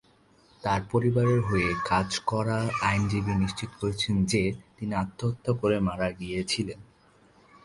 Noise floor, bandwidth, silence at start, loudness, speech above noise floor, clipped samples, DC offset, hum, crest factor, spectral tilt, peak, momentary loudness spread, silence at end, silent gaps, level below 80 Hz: -60 dBFS; 11.5 kHz; 0.65 s; -27 LUFS; 34 dB; under 0.1%; under 0.1%; none; 16 dB; -5.5 dB/octave; -10 dBFS; 8 LU; 0.8 s; none; -48 dBFS